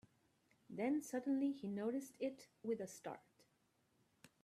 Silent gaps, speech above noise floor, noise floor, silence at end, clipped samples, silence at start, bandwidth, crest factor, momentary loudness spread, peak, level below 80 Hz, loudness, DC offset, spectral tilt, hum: none; 37 dB; -80 dBFS; 0.15 s; under 0.1%; 0.7 s; 14.5 kHz; 18 dB; 12 LU; -28 dBFS; -88 dBFS; -44 LUFS; under 0.1%; -6 dB/octave; none